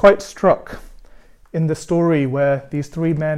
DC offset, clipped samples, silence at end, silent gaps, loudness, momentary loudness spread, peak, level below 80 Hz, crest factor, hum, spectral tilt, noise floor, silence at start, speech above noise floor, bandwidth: under 0.1%; under 0.1%; 0 s; none; -19 LUFS; 11 LU; 0 dBFS; -44 dBFS; 18 dB; none; -7 dB/octave; -44 dBFS; 0 s; 27 dB; 13 kHz